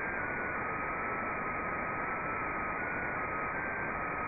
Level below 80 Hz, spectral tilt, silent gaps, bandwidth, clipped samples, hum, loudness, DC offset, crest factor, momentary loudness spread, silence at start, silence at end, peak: -54 dBFS; 0.5 dB/octave; none; 2.7 kHz; under 0.1%; none; -35 LUFS; under 0.1%; 12 dB; 0 LU; 0 s; 0 s; -22 dBFS